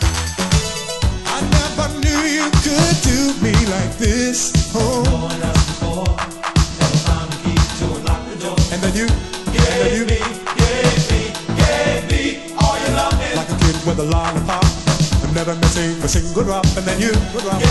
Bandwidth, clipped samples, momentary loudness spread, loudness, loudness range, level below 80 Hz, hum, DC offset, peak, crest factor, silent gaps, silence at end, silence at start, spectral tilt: 12.5 kHz; under 0.1%; 5 LU; -17 LUFS; 2 LU; -22 dBFS; none; under 0.1%; 0 dBFS; 16 dB; none; 0 s; 0 s; -4.5 dB/octave